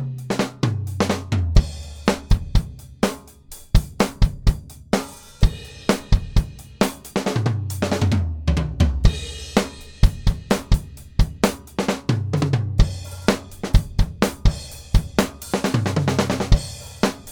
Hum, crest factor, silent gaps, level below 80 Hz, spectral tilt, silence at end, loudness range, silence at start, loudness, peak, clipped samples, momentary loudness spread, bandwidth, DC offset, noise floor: none; 20 dB; none; -24 dBFS; -6 dB/octave; 0 s; 2 LU; 0 s; -23 LUFS; -2 dBFS; under 0.1%; 5 LU; 19.5 kHz; under 0.1%; -42 dBFS